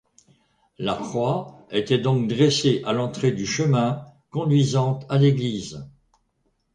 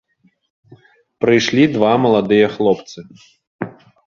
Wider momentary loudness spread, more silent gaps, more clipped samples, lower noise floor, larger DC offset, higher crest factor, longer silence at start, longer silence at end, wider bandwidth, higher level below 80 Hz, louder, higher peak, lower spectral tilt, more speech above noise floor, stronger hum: second, 11 LU vs 17 LU; second, none vs 3.47-3.59 s; neither; first, -70 dBFS vs -48 dBFS; neither; about the same, 16 dB vs 16 dB; second, 0.8 s vs 1.2 s; first, 0.85 s vs 0.35 s; first, 9.8 kHz vs 7.2 kHz; about the same, -58 dBFS vs -56 dBFS; second, -22 LUFS vs -15 LUFS; second, -6 dBFS vs 0 dBFS; about the same, -6 dB/octave vs -6 dB/octave; first, 48 dB vs 33 dB; neither